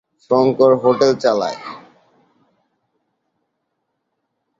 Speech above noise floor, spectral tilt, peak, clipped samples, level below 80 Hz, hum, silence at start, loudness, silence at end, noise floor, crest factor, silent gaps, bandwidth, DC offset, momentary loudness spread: 58 dB; -6 dB/octave; -2 dBFS; under 0.1%; -62 dBFS; none; 0.3 s; -15 LUFS; 2.8 s; -73 dBFS; 18 dB; none; 7.6 kHz; under 0.1%; 14 LU